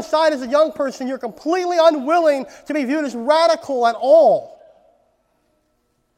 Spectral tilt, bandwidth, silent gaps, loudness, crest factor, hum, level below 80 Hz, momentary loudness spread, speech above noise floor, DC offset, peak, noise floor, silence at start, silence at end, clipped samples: -3.5 dB/octave; 12.5 kHz; none; -17 LUFS; 18 dB; none; -66 dBFS; 11 LU; 50 dB; under 0.1%; 0 dBFS; -66 dBFS; 0 s; 1.65 s; under 0.1%